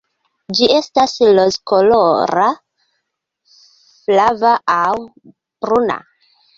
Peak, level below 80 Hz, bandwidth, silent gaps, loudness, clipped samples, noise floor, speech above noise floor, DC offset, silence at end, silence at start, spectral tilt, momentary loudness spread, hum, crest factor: 0 dBFS; -54 dBFS; 7.6 kHz; none; -14 LUFS; under 0.1%; -73 dBFS; 60 dB; under 0.1%; 0.6 s; 0.5 s; -4 dB/octave; 11 LU; none; 16 dB